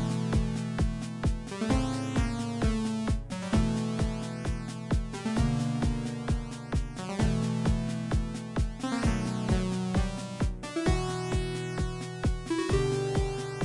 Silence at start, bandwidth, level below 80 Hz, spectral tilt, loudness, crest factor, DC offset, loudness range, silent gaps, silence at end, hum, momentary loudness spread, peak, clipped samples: 0 s; 11.5 kHz; -36 dBFS; -6.5 dB/octave; -31 LUFS; 16 dB; under 0.1%; 1 LU; none; 0 s; none; 6 LU; -14 dBFS; under 0.1%